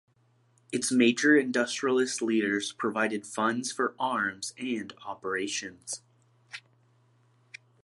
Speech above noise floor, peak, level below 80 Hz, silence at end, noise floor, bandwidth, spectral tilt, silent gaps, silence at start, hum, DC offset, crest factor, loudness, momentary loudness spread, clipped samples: 38 dB; -10 dBFS; -76 dBFS; 1.25 s; -66 dBFS; 12 kHz; -3 dB/octave; none; 0.7 s; none; under 0.1%; 20 dB; -28 LUFS; 16 LU; under 0.1%